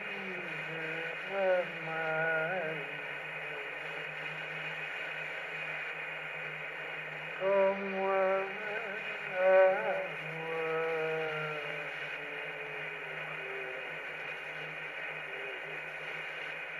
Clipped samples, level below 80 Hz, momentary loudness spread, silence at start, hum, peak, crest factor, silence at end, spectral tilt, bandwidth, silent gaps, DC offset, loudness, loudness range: under 0.1%; -76 dBFS; 9 LU; 0 s; none; -14 dBFS; 20 dB; 0 s; -5 dB/octave; 13.5 kHz; none; under 0.1%; -35 LUFS; 8 LU